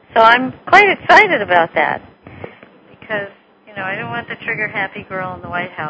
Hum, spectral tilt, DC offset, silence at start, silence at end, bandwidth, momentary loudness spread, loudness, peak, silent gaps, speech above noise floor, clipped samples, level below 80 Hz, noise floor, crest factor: none; -4.5 dB/octave; under 0.1%; 0.15 s; 0 s; 8 kHz; 18 LU; -14 LUFS; 0 dBFS; none; 29 dB; 0.4%; -52 dBFS; -44 dBFS; 16 dB